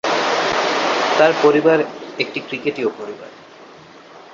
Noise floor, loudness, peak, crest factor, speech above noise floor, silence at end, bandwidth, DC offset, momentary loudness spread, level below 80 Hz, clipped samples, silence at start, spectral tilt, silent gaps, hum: -42 dBFS; -17 LUFS; -2 dBFS; 16 dB; 25 dB; 0 s; 7.6 kHz; under 0.1%; 17 LU; -62 dBFS; under 0.1%; 0.05 s; -4 dB/octave; none; none